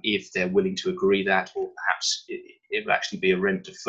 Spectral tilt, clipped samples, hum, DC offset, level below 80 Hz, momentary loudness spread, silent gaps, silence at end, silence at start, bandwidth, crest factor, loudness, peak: -3.5 dB/octave; under 0.1%; none; under 0.1%; -62 dBFS; 8 LU; none; 0 s; 0.05 s; 8.4 kHz; 20 dB; -25 LUFS; -6 dBFS